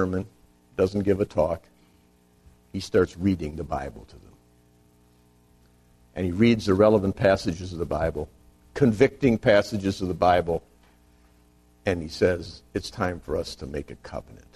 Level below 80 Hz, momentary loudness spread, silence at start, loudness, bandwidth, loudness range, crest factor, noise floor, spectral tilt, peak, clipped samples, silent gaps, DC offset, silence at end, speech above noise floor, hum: -46 dBFS; 17 LU; 0 s; -25 LUFS; 13.5 kHz; 7 LU; 22 dB; -60 dBFS; -6.5 dB/octave; -4 dBFS; under 0.1%; none; under 0.1%; 0.2 s; 36 dB; 60 Hz at -50 dBFS